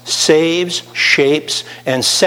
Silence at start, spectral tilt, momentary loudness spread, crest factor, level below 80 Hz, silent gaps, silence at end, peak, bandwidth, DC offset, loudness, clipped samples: 0.05 s; -2.5 dB/octave; 8 LU; 14 dB; -62 dBFS; none; 0 s; 0 dBFS; 17 kHz; under 0.1%; -13 LUFS; under 0.1%